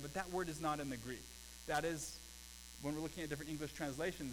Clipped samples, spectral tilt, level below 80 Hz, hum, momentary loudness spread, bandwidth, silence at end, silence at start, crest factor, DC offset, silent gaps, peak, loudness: under 0.1%; -4 dB/octave; -60 dBFS; none; 12 LU; 19.5 kHz; 0 s; 0 s; 20 dB; under 0.1%; none; -24 dBFS; -44 LUFS